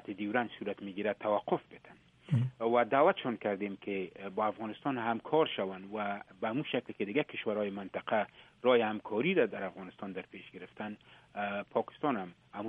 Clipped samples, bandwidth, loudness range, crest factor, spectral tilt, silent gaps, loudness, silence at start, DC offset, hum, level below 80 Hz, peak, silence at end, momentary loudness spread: under 0.1%; 4.4 kHz; 3 LU; 20 dB; -8.5 dB/octave; none; -34 LUFS; 0.05 s; under 0.1%; none; -76 dBFS; -14 dBFS; 0 s; 14 LU